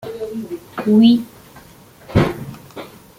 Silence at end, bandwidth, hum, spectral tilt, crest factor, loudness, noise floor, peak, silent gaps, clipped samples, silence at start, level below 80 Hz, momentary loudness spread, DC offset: 0.35 s; 16 kHz; none; -7.5 dB/octave; 16 dB; -17 LUFS; -44 dBFS; -2 dBFS; none; under 0.1%; 0.05 s; -42 dBFS; 23 LU; under 0.1%